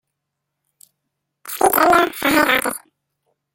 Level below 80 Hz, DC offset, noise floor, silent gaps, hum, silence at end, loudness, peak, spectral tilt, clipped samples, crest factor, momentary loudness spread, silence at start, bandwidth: -52 dBFS; under 0.1%; -79 dBFS; none; none; 0.75 s; -16 LUFS; 0 dBFS; -2.5 dB/octave; under 0.1%; 20 dB; 15 LU; 1.45 s; 17 kHz